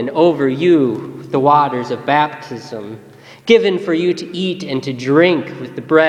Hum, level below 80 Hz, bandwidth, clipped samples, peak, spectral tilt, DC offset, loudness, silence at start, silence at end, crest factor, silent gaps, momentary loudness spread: none; -62 dBFS; 9.4 kHz; under 0.1%; 0 dBFS; -6.5 dB/octave; under 0.1%; -15 LUFS; 0 s; 0 s; 16 dB; none; 16 LU